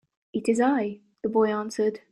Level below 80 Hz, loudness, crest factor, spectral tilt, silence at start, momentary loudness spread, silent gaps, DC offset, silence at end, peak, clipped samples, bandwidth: -68 dBFS; -26 LUFS; 14 dB; -5.5 dB/octave; 0.35 s; 11 LU; none; under 0.1%; 0.15 s; -10 dBFS; under 0.1%; 11 kHz